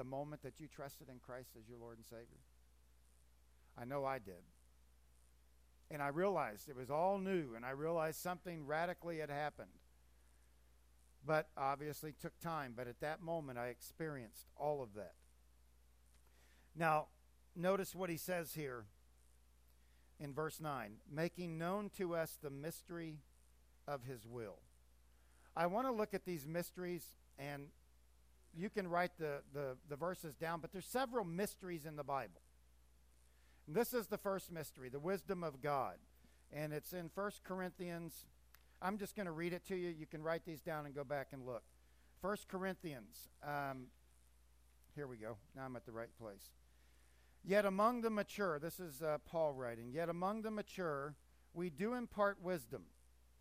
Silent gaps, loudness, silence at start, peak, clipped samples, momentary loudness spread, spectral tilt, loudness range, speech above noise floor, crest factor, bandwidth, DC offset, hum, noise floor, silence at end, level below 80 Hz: none; -44 LUFS; 0 s; -22 dBFS; under 0.1%; 15 LU; -5.5 dB/octave; 9 LU; 27 dB; 22 dB; 15.5 kHz; under 0.1%; 60 Hz at -70 dBFS; -70 dBFS; 0.5 s; -70 dBFS